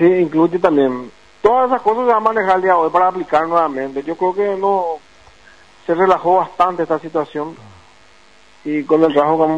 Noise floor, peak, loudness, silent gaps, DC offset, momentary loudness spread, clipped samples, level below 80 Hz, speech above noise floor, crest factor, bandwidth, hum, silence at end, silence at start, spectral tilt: -49 dBFS; 0 dBFS; -16 LUFS; none; 0.3%; 11 LU; under 0.1%; -56 dBFS; 34 dB; 16 dB; 9.4 kHz; none; 0 s; 0 s; -7.5 dB/octave